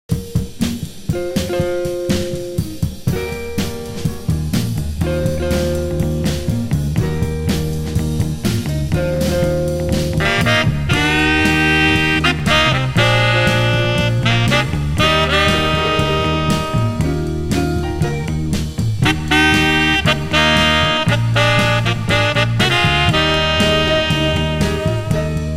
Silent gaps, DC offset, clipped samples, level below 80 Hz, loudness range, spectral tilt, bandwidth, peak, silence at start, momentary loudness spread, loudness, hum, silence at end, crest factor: none; under 0.1%; under 0.1%; -28 dBFS; 8 LU; -5 dB/octave; 16 kHz; 0 dBFS; 0.1 s; 8 LU; -16 LUFS; none; 0 s; 16 dB